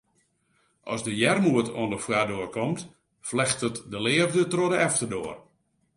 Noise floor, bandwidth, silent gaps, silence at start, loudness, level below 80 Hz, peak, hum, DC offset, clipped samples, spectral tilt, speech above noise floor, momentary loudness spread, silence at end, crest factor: -70 dBFS; 11.5 kHz; none; 0.85 s; -26 LUFS; -62 dBFS; -8 dBFS; none; under 0.1%; under 0.1%; -4 dB/octave; 44 dB; 13 LU; 0.55 s; 20 dB